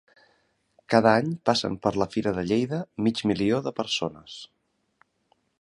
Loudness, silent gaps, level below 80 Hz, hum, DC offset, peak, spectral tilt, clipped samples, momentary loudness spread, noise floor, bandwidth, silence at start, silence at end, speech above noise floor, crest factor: -25 LUFS; none; -58 dBFS; none; under 0.1%; -2 dBFS; -5.5 dB/octave; under 0.1%; 10 LU; -69 dBFS; 11 kHz; 0.9 s; 1.15 s; 45 dB; 24 dB